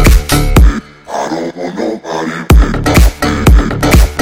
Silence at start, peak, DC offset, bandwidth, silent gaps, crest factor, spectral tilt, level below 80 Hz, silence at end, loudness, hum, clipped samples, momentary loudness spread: 0 s; 0 dBFS; under 0.1%; 16.5 kHz; none; 8 dB; -5.5 dB/octave; -10 dBFS; 0 s; -11 LUFS; none; 2%; 10 LU